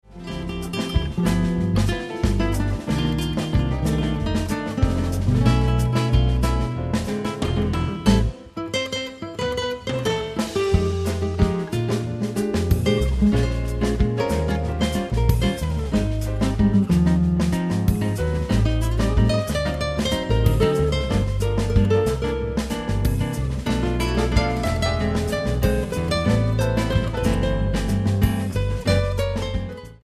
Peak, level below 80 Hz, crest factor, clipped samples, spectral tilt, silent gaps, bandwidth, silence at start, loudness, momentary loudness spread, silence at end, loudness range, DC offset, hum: -2 dBFS; -28 dBFS; 18 dB; under 0.1%; -6.5 dB/octave; none; 14 kHz; 0.1 s; -22 LUFS; 6 LU; 0.1 s; 3 LU; under 0.1%; none